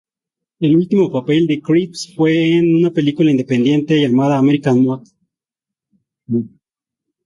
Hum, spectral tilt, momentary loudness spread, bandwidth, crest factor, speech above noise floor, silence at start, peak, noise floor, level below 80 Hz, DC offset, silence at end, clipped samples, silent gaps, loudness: none; -7 dB/octave; 9 LU; 11.5 kHz; 14 dB; 72 dB; 0.6 s; -2 dBFS; -86 dBFS; -58 dBFS; under 0.1%; 0.8 s; under 0.1%; none; -15 LUFS